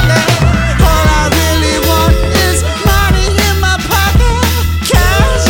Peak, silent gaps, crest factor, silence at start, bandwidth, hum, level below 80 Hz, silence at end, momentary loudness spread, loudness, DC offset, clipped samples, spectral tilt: 0 dBFS; none; 10 dB; 0 s; 19.5 kHz; none; -14 dBFS; 0 s; 3 LU; -10 LUFS; 0.5%; 0.3%; -4.5 dB/octave